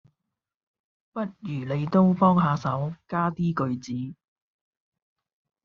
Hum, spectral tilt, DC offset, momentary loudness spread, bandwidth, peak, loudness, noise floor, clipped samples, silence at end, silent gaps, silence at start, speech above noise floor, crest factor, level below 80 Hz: none; -8 dB/octave; under 0.1%; 14 LU; 7 kHz; -6 dBFS; -25 LUFS; -85 dBFS; under 0.1%; 1.5 s; none; 1.15 s; 61 dB; 20 dB; -62 dBFS